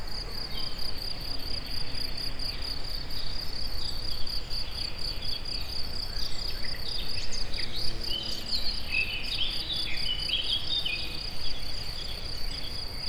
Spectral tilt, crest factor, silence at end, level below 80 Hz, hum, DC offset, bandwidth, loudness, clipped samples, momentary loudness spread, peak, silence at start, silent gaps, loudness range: -2.5 dB/octave; 14 dB; 0 s; -38 dBFS; none; under 0.1%; 15 kHz; -32 LUFS; under 0.1%; 7 LU; -14 dBFS; 0 s; none; 5 LU